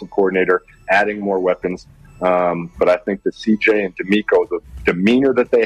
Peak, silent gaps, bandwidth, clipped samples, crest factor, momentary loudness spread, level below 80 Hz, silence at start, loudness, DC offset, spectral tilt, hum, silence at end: -2 dBFS; none; 9.8 kHz; under 0.1%; 14 dB; 7 LU; -46 dBFS; 0 s; -17 LUFS; under 0.1%; -6.5 dB/octave; none; 0 s